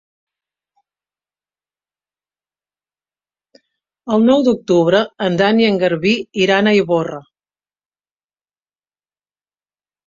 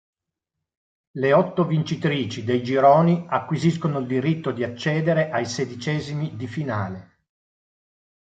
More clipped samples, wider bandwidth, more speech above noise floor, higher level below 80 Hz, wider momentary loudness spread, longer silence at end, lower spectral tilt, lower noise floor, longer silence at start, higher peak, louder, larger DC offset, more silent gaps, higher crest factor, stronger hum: neither; about the same, 7.6 kHz vs 8 kHz; first, over 76 dB vs 62 dB; about the same, -60 dBFS vs -58 dBFS; second, 7 LU vs 11 LU; first, 2.85 s vs 1.3 s; about the same, -6 dB/octave vs -7 dB/octave; first, under -90 dBFS vs -83 dBFS; first, 4.05 s vs 1.15 s; first, 0 dBFS vs -4 dBFS; first, -15 LUFS vs -22 LUFS; neither; neither; about the same, 18 dB vs 20 dB; first, 50 Hz at -45 dBFS vs none